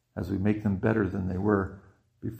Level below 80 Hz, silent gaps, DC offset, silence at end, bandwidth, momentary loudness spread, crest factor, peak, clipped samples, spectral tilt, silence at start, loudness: -52 dBFS; none; under 0.1%; 0 s; 14.5 kHz; 8 LU; 20 dB; -10 dBFS; under 0.1%; -10 dB/octave; 0.15 s; -28 LUFS